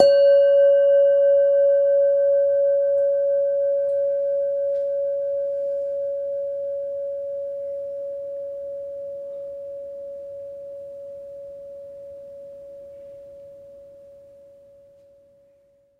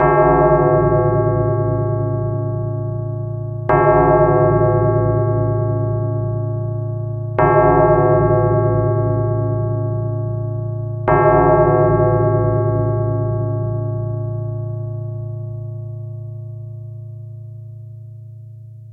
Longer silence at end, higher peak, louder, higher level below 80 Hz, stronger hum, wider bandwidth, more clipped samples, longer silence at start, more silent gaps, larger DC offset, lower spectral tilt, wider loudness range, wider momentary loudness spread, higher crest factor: first, 1.85 s vs 0 s; about the same, 0 dBFS vs -2 dBFS; second, -21 LUFS vs -17 LUFS; second, -68 dBFS vs -34 dBFS; neither; first, 4.7 kHz vs 3 kHz; neither; about the same, 0 s vs 0 s; neither; neither; second, -4 dB/octave vs -13 dB/octave; first, 23 LU vs 12 LU; first, 24 LU vs 19 LU; first, 22 dB vs 14 dB